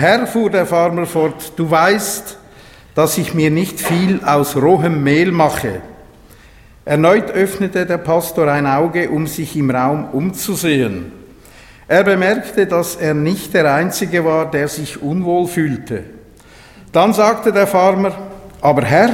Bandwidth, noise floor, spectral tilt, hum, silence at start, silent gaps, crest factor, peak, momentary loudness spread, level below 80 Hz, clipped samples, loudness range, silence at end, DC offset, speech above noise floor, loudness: 17 kHz; -43 dBFS; -5.5 dB/octave; none; 0 s; none; 14 dB; 0 dBFS; 9 LU; -48 dBFS; under 0.1%; 2 LU; 0 s; under 0.1%; 28 dB; -15 LUFS